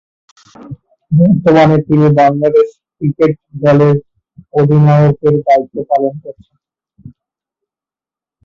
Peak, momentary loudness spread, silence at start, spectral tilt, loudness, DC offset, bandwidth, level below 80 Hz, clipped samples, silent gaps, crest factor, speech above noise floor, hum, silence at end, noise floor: 0 dBFS; 11 LU; 0.65 s; -9.5 dB/octave; -11 LUFS; under 0.1%; 7 kHz; -48 dBFS; under 0.1%; none; 12 dB; 79 dB; none; 1.35 s; -89 dBFS